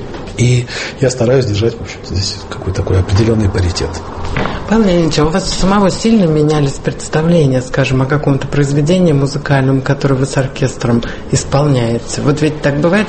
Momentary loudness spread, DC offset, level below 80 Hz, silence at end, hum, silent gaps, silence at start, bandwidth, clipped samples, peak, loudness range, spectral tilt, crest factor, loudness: 8 LU; under 0.1%; -28 dBFS; 0 s; none; none; 0 s; 8.8 kHz; under 0.1%; 0 dBFS; 3 LU; -6 dB/octave; 12 dB; -13 LUFS